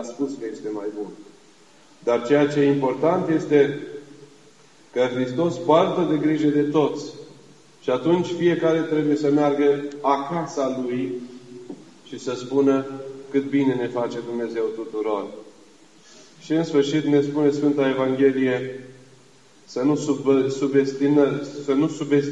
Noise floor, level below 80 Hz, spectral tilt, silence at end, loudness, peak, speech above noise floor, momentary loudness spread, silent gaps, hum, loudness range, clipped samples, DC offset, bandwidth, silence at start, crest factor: -53 dBFS; -74 dBFS; -6.5 dB/octave; 0 s; -22 LUFS; -4 dBFS; 32 dB; 14 LU; none; none; 4 LU; under 0.1%; 0.2%; 8.8 kHz; 0 s; 20 dB